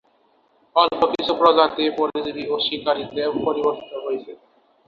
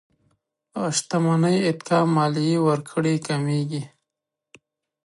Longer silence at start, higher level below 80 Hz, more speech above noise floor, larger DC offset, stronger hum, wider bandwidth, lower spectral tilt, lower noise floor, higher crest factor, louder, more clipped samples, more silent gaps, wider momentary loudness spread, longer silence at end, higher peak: about the same, 0.75 s vs 0.75 s; first, -60 dBFS vs -70 dBFS; second, 40 dB vs 63 dB; neither; neither; second, 7 kHz vs 11.5 kHz; about the same, -5.5 dB/octave vs -6 dB/octave; second, -61 dBFS vs -85 dBFS; about the same, 20 dB vs 18 dB; about the same, -21 LUFS vs -22 LUFS; neither; neither; about the same, 12 LU vs 10 LU; second, 0.55 s vs 1.2 s; first, -2 dBFS vs -6 dBFS